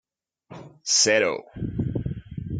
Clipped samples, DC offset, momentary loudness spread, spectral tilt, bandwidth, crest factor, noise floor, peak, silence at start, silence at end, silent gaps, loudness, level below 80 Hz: under 0.1%; under 0.1%; 16 LU; -2.5 dB/octave; 11 kHz; 20 dB; -51 dBFS; -8 dBFS; 0.5 s; 0 s; none; -23 LUFS; -46 dBFS